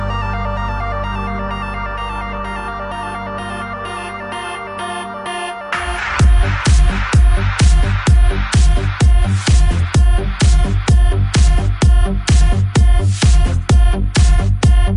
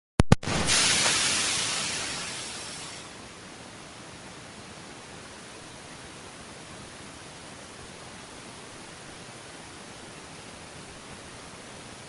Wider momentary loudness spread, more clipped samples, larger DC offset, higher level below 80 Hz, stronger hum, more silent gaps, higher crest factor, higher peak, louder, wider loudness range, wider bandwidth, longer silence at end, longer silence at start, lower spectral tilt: second, 11 LU vs 20 LU; neither; neither; first, -14 dBFS vs -48 dBFS; neither; neither; second, 12 dB vs 32 dB; about the same, -2 dBFS vs 0 dBFS; first, -16 LUFS vs -25 LUFS; second, 10 LU vs 17 LU; second, 11 kHz vs 13 kHz; about the same, 0 s vs 0 s; second, 0 s vs 0.2 s; first, -5.5 dB/octave vs -2.5 dB/octave